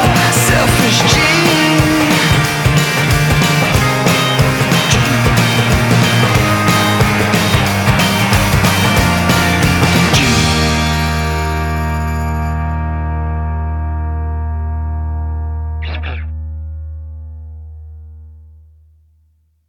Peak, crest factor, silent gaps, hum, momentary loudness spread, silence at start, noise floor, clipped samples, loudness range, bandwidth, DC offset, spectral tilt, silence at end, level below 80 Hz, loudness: 0 dBFS; 12 dB; none; none; 12 LU; 0 s; -56 dBFS; under 0.1%; 13 LU; 19.5 kHz; under 0.1%; -4.5 dB/octave; 1.25 s; -24 dBFS; -13 LUFS